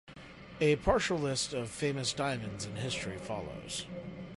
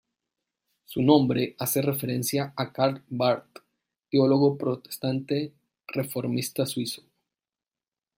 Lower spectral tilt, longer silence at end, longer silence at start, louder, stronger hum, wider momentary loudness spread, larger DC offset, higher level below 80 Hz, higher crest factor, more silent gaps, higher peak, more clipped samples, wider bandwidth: second, -4 dB/octave vs -5.5 dB/octave; second, 0.05 s vs 1.2 s; second, 0.05 s vs 0.9 s; second, -34 LUFS vs -26 LUFS; neither; first, 14 LU vs 11 LU; neither; first, -52 dBFS vs -68 dBFS; about the same, 20 dB vs 22 dB; neither; second, -14 dBFS vs -6 dBFS; neither; second, 11.5 kHz vs 16.5 kHz